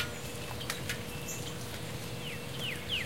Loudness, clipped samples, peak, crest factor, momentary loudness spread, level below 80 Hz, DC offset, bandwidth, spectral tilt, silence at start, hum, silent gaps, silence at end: -38 LUFS; under 0.1%; -18 dBFS; 22 dB; 4 LU; -54 dBFS; 0.4%; 17 kHz; -3 dB/octave; 0 s; none; none; 0 s